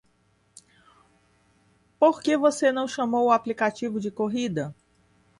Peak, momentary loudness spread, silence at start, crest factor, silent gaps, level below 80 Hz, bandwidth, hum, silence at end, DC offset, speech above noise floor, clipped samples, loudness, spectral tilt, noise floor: -8 dBFS; 9 LU; 2 s; 18 dB; none; -68 dBFS; 11.5 kHz; none; 0.65 s; under 0.1%; 42 dB; under 0.1%; -24 LUFS; -5 dB/octave; -66 dBFS